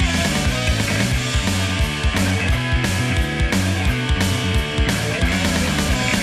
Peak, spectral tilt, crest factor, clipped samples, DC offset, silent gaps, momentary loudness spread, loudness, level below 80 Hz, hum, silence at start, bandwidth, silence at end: -4 dBFS; -4.5 dB/octave; 14 dB; under 0.1%; under 0.1%; none; 1 LU; -19 LUFS; -26 dBFS; none; 0 s; 14 kHz; 0 s